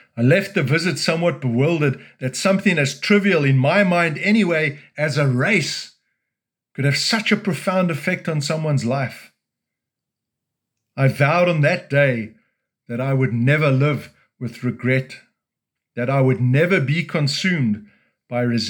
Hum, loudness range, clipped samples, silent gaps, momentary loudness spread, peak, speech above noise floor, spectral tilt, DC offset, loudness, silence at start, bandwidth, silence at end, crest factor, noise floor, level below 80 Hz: none; 4 LU; under 0.1%; none; 11 LU; -2 dBFS; 65 dB; -6 dB/octave; under 0.1%; -19 LUFS; 0.15 s; 17.5 kHz; 0 s; 18 dB; -84 dBFS; -70 dBFS